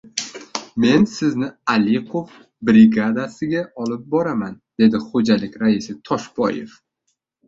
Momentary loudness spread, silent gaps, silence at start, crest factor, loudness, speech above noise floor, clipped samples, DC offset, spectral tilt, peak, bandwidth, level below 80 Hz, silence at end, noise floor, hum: 14 LU; none; 0.15 s; 18 dB; -19 LUFS; 55 dB; under 0.1%; under 0.1%; -5.5 dB/octave; -2 dBFS; 7.8 kHz; -56 dBFS; 0.8 s; -73 dBFS; none